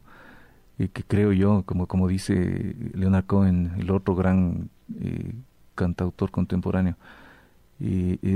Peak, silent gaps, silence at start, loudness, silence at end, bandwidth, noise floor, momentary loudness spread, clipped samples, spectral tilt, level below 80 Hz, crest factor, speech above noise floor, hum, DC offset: -12 dBFS; none; 0.3 s; -25 LUFS; 0 s; 11 kHz; -54 dBFS; 12 LU; under 0.1%; -8.5 dB/octave; -46 dBFS; 12 dB; 31 dB; none; under 0.1%